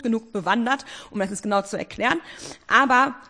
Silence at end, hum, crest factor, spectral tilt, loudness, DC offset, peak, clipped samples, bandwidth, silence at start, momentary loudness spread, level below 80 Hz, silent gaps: 0.05 s; none; 20 dB; -4 dB/octave; -22 LUFS; under 0.1%; -2 dBFS; under 0.1%; 10.5 kHz; 0 s; 14 LU; -58 dBFS; none